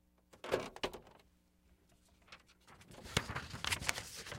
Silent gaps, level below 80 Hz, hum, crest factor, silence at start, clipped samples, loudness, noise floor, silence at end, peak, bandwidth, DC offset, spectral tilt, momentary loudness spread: none; -60 dBFS; none; 36 dB; 0.35 s; under 0.1%; -40 LUFS; -71 dBFS; 0 s; -8 dBFS; 16.5 kHz; under 0.1%; -3 dB/octave; 22 LU